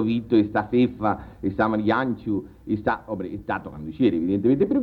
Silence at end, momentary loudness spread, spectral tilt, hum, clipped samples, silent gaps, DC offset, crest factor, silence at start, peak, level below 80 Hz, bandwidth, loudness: 0 s; 9 LU; -9.5 dB/octave; none; under 0.1%; none; under 0.1%; 16 dB; 0 s; -8 dBFS; -50 dBFS; 5.2 kHz; -24 LUFS